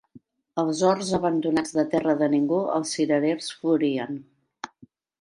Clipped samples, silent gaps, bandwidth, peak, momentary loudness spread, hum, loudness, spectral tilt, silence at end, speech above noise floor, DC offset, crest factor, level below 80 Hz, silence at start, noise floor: under 0.1%; none; 11 kHz; -8 dBFS; 15 LU; none; -24 LUFS; -5 dB/octave; 0.55 s; 33 dB; under 0.1%; 18 dB; -64 dBFS; 0.15 s; -56 dBFS